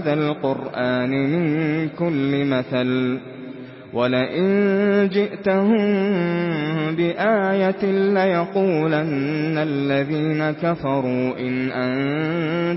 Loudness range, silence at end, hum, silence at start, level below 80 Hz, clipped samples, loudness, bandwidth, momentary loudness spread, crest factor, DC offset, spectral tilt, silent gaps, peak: 2 LU; 0 s; none; 0 s; -60 dBFS; under 0.1%; -21 LUFS; 5.8 kHz; 5 LU; 14 dB; under 0.1%; -11.5 dB/octave; none; -6 dBFS